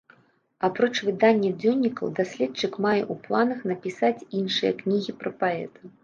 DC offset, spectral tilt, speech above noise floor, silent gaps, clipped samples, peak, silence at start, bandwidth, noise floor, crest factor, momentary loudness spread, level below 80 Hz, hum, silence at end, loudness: under 0.1%; -5.5 dB/octave; 35 dB; none; under 0.1%; -6 dBFS; 0.6 s; 7.4 kHz; -60 dBFS; 18 dB; 8 LU; -72 dBFS; none; 0.15 s; -25 LUFS